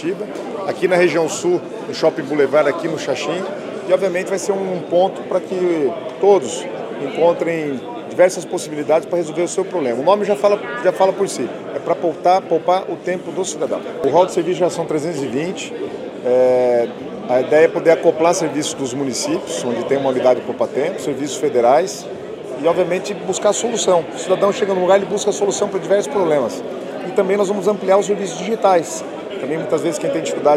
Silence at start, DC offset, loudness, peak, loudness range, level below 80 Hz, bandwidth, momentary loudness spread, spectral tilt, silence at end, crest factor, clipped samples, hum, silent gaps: 0 s; under 0.1%; -18 LUFS; 0 dBFS; 2 LU; -66 dBFS; 14 kHz; 10 LU; -4.5 dB/octave; 0 s; 18 dB; under 0.1%; none; none